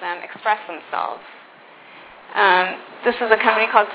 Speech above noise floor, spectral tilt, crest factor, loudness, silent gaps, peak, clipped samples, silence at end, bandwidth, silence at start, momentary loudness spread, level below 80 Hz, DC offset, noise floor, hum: 26 dB; -6.5 dB/octave; 20 dB; -19 LUFS; none; 0 dBFS; under 0.1%; 0 s; 4 kHz; 0 s; 13 LU; -68 dBFS; under 0.1%; -45 dBFS; none